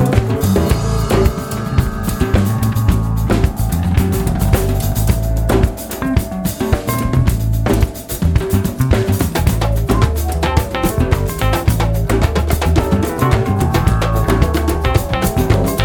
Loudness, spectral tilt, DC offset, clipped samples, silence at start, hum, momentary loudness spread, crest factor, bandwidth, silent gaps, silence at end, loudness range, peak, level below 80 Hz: -16 LUFS; -6.5 dB/octave; under 0.1%; under 0.1%; 0 s; none; 3 LU; 14 dB; 19.5 kHz; none; 0 s; 2 LU; 0 dBFS; -20 dBFS